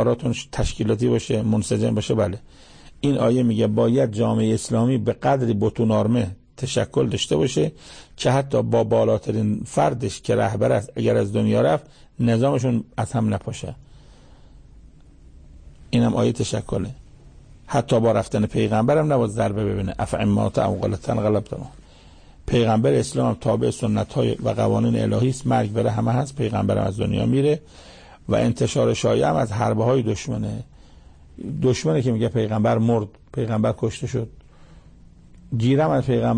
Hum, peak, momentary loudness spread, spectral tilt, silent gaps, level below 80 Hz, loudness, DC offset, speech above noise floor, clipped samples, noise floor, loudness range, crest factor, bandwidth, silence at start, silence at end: none; -8 dBFS; 8 LU; -7 dB/octave; none; -44 dBFS; -21 LUFS; under 0.1%; 27 dB; under 0.1%; -47 dBFS; 4 LU; 14 dB; 9.8 kHz; 0 s; 0 s